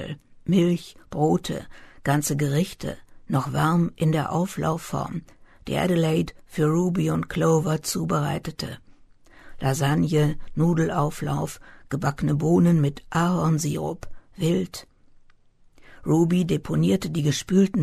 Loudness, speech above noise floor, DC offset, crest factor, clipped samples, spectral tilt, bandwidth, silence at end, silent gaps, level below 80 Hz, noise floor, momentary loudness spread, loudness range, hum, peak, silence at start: -24 LUFS; 31 dB; under 0.1%; 16 dB; under 0.1%; -6.5 dB/octave; 13.5 kHz; 0 s; none; -48 dBFS; -54 dBFS; 13 LU; 3 LU; none; -8 dBFS; 0 s